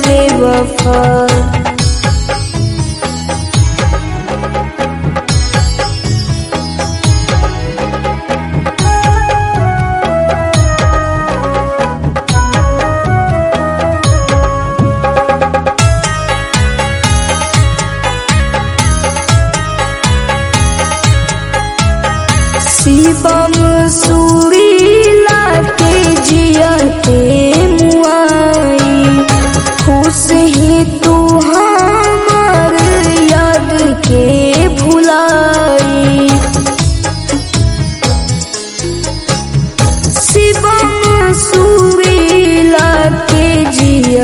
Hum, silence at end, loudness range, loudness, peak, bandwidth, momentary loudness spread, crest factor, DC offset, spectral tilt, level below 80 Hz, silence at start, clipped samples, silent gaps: none; 0 s; 6 LU; -10 LUFS; 0 dBFS; 14.5 kHz; 7 LU; 10 dB; under 0.1%; -5 dB/octave; -18 dBFS; 0 s; 0.8%; none